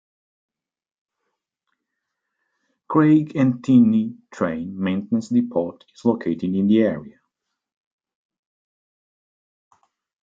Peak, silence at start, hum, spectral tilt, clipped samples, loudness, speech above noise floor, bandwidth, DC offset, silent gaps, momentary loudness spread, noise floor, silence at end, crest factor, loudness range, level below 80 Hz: -4 dBFS; 2.9 s; none; -8.5 dB/octave; under 0.1%; -20 LUFS; 61 dB; 7.6 kHz; under 0.1%; none; 10 LU; -80 dBFS; 3.2 s; 20 dB; 6 LU; -66 dBFS